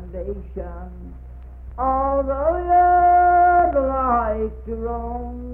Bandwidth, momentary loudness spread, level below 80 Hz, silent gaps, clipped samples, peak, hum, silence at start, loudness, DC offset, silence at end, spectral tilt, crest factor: 3 kHz; 22 LU; -34 dBFS; none; under 0.1%; -8 dBFS; none; 0 s; -18 LUFS; under 0.1%; 0 s; -11 dB/octave; 12 dB